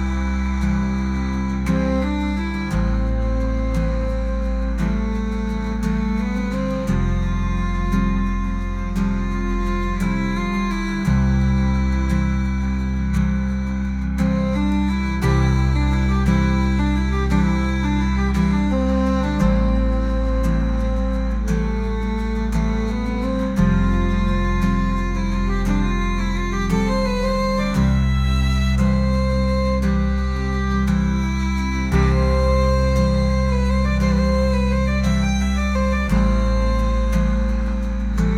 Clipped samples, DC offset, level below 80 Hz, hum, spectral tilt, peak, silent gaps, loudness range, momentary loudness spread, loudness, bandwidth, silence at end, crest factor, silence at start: under 0.1%; under 0.1%; -22 dBFS; none; -7 dB/octave; -6 dBFS; none; 3 LU; 5 LU; -21 LUFS; 10.5 kHz; 0 s; 12 dB; 0 s